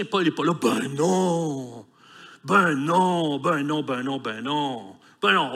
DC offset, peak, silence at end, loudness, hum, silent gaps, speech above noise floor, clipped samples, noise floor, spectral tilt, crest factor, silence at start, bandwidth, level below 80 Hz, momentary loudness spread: under 0.1%; -6 dBFS; 0 s; -23 LUFS; none; none; 25 dB; under 0.1%; -48 dBFS; -5 dB/octave; 18 dB; 0 s; 15 kHz; -74 dBFS; 10 LU